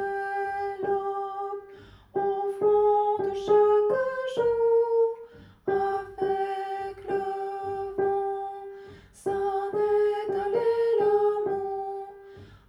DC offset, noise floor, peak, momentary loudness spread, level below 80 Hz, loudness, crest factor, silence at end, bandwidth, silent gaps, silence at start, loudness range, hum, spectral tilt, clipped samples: under 0.1%; -49 dBFS; -12 dBFS; 13 LU; -62 dBFS; -27 LUFS; 16 dB; 0.1 s; 10.5 kHz; none; 0 s; 6 LU; none; -6 dB/octave; under 0.1%